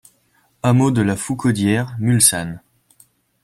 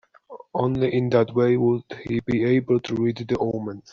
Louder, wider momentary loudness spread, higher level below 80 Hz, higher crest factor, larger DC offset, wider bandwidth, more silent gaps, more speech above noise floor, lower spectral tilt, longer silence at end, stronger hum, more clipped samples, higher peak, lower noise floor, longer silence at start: first, -17 LUFS vs -23 LUFS; first, 12 LU vs 8 LU; about the same, -52 dBFS vs -54 dBFS; about the same, 20 dB vs 18 dB; neither; first, 15 kHz vs 6.8 kHz; neither; first, 44 dB vs 23 dB; second, -4.5 dB/octave vs -7 dB/octave; first, 0.85 s vs 0.1 s; neither; neither; first, 0 dBFS vs -6 dBFS; first, -61 dBFS vs -45 dBFS; first, 0.65 s vs 0.3 s